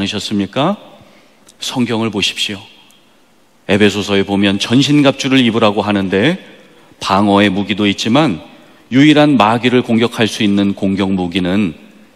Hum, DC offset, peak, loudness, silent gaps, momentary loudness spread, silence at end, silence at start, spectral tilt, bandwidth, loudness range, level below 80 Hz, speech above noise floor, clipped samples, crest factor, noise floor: none; 0.2%; 0 dBFS; -13 LUFS; none; 9 LU; 0.4 s; 0 s; -5 dB/octave; 13.5 kHz; 6 LU; -56 dBFS; 39 dB; 0.1%; 14 dB; -52 dBFS